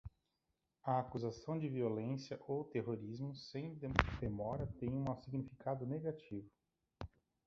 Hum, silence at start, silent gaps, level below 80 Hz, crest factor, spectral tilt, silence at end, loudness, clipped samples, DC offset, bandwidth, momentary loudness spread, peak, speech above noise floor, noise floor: none; 0.05 s; none; -56 dBFS; 36 dB; -6 dB/octave; 0.4 s; -42 LUFS; under 0.1%; under 0.1%; 7.4 kHz; 13 LU; -8 dBFS; 46 dB; -87 dBFS